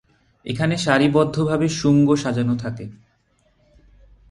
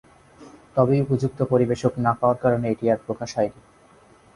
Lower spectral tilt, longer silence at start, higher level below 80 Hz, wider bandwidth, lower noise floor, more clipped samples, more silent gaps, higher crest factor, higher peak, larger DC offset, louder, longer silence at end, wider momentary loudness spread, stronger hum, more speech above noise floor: second, -6 dB/octave vs -8 dB/octave; about the same, 0.45 s vs 0.4 s; about the same, -50 dBFS vs -54 dBFS; about the same, 11.5 kHz vs 11 kHz; first, -63 dBFS vs -53 dBFS; neither; neither; about the same, 18 dB vs 18 dB; about the same, -2 dBFS vs -4 dBFS; neither; first, -19 LUFS vs -22 LUFS; first, 1.35 s vs 0.85 s; first, 16 LU vs 6 LU; neither; first, 44 dB vs 32 dB